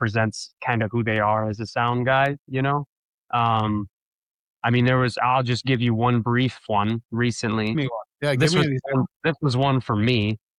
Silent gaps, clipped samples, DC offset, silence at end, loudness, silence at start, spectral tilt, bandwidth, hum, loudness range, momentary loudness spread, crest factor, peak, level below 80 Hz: 0.53-0.57 s, 2.39-2.46 s, 2.86-3.28 s, 3.89-4.60 s, 7.05-7.09 s, 9.16-9.20 s; under 0.1%; under 0.1%; 0.2 s; -23 LUFS; 0 s; -6.5 dB/octave; 11 kHz; none; 2 LU; 7 LU; 14 dB; -8 dBFS; -56 dBFS